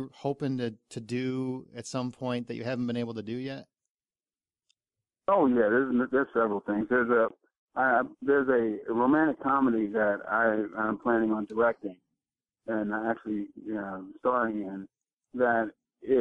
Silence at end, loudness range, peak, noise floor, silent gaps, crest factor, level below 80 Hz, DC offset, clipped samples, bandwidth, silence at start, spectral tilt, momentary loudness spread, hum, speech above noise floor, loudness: 0 s; 8 LU; -12 dBFS; under -90 dBFS; 3.90-3.95 s, 7.58-7.68 s; 16 dB; -68 dBFS; under 0.1%; under 0.1%; 10.5 kHz; 0 s; -7 dB/octave; 12 LU; none; over 62 dB; -28 LUFS